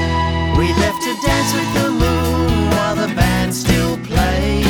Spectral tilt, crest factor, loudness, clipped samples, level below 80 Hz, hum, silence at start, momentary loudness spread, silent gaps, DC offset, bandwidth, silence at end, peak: -5 dB/octave; 16 dB; -16 LUFS; under 0.1%; -24 dBFS; none; 0 s; 2 LU; none; under 0.1%; over 20 kHz; 0 s; 0 dBFS